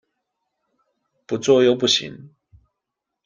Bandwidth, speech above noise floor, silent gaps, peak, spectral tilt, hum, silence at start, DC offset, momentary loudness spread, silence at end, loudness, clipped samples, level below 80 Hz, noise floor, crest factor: 9.8 kHz; 64 dB; none; -4 dBFS; -4 dB/octave; none; 1.3 s; under 0.1%; 14 LU; 1 s; -18 LUFS; under 0.1%; -64 dBFS; -82 dBFS; 20 dB